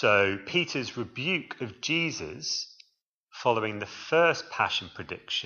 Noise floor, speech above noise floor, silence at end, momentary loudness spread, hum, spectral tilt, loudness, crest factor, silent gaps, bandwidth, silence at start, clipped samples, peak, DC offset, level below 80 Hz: -72 dBFS; 44 dB; 0 s; 14 LU; none; -3.5 dB/octave; -28 LUFS; 22 dB; 3.03-3.27 s; 7.2 kHz; 0 s; under 0.1%; -8 dBFS; under 0.1%; -68 dBFS